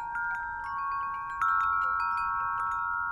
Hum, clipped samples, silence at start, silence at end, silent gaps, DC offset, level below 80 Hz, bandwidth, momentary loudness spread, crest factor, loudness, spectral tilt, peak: none; under 0.1%; 0 s; 0 s; none; under 0.1%; -56 dBFS; 11 kHz; 7 LU; 12 dB; -30 LUFS; -3 dB/octave; -18 dBFS